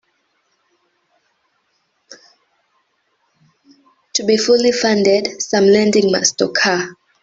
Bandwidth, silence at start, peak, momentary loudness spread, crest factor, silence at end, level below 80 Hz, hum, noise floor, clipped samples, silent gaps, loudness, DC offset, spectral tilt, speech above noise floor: 8 kHz; 2.1 s; 0 dBFS; 7 LU; 18 dB; 0.3 s; -60 dBFS; none; -66 dBFS; under 0.1%; none; -14 LUFS; under 0.1%; -3 dB/octave; 52 dB